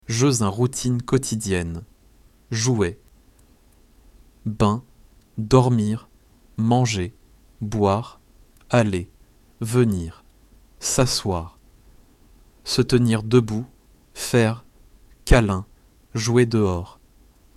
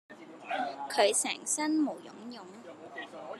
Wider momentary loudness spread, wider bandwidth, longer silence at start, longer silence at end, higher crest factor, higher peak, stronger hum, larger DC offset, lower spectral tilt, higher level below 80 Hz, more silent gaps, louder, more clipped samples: second, 17 LU vs 21 LU; about the same, 14.5 kHz vs 13.5 kHz; about the same, 0.1 s vs 0.1 s; first, 0.65 s vs 0 s; about the same, 22 dB vs 24 dB; first, -2 dBFS vs -10 dBFS; neither; neither; first, -5.5 dB/octave vs -1.5 dB/octave; first, -36 dBFS vs under -90 dBFS; neither; first, -22 LUFS vs -30 LUFS; neither